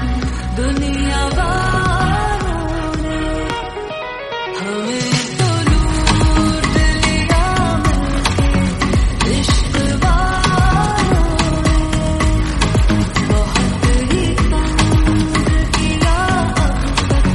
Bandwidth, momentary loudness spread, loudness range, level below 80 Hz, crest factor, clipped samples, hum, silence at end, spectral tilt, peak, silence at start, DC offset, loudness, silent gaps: 11.5 kHz; 6 LU; 4 LU; -18 dBFS; 14 dB; under 0.1%; none; 0 s; -5 dB/octave; 0 dBFS; 0 s; under 0.1%; -16 LUFS; none